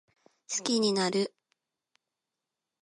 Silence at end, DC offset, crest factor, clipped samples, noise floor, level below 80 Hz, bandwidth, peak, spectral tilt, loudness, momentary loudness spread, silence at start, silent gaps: 1.55 s; under 0.1%; 20 dB; under 0.1%; -88 dBFS; -82 dBFS; 11.5 kHz; -12 dBFS; -3.5 dB/octave; -29 LUFS; 9 LU; 0.5 s; none